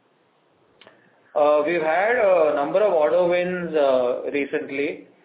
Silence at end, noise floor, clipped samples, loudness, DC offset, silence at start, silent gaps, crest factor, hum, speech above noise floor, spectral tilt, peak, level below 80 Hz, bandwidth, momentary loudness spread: 0.2 s; -62 dBFS; under 0.1%; -21 LUFS; under 0.1%; 1.35 s; none; 14 dB; none; 42 dB; -9.5 dB/octave; -8 dBFS; -68 dBFS; 4 kHz; 8 LU